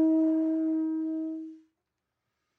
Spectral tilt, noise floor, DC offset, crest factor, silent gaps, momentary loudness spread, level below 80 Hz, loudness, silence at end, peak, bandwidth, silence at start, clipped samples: -8 dB/octave; -84 dBFS; under 0.1%; 12 dB; none; 14 LU; under -90 dBFS; -29 LUFS; 1 s; -18 dBFS; 2 kHz; 0 s; under 0.1%